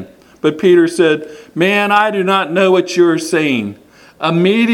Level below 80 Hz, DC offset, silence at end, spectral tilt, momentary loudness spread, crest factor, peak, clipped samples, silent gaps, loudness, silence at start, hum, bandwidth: -60 dBFS; under 0.1%; 0 s; -5.5 dB/octave; 9 LU; 14 dB; 0 dBFS; under 0.1%; none; -13 LUFS; 0 s; none; 13.5 kHz